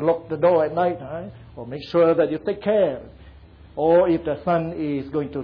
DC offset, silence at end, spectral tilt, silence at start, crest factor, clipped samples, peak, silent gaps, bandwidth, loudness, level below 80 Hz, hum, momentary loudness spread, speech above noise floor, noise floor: under 0.1%; 0 s; -9.5 dB/octave; 0 s; 14 dB; under 0.1%; -8 dBFS; none; 5.2 kHz; -21 LUFS; -50 dBFS; none; 17 LU; 24 dB; -46 dBFS